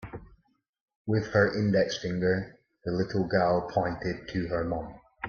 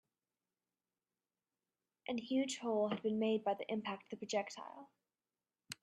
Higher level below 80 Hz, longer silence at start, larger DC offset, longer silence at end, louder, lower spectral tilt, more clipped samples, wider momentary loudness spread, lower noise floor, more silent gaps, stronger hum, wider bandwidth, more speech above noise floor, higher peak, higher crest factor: first, -54 dBFS vs -88 dBFS; second, 0 s vs 2.1 s; neither; about the same, 0 s vs 0.1 s; first, -28 LUFS vs -39 LUFS; first, -6.5 dB/octave vs -4.5 dB/octave; neither; about the same, 16 LU vs 16 LU; second, -69 dBFS vs under -90 dBFS; first, 0.69-0.73 s, 0.80-0.88 s, 0.96-1.05 s vs none; neither; second, 7 kHz vs 13 kHz; second, 42 dB vs over 51 dB; first, -8 dBFS vs -24 dBFS; about the same, 22 dB vs 18 dB